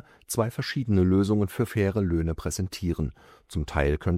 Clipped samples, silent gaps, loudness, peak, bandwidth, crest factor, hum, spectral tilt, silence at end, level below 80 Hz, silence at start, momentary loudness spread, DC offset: under 0.1%; none; -27 LUFS; -10 dBFS; 16 kHz; 16 dB; none; -6.5 dB/octave; 0 s; -40 dBFS; 0.3 s; 9 LU; under 0.1%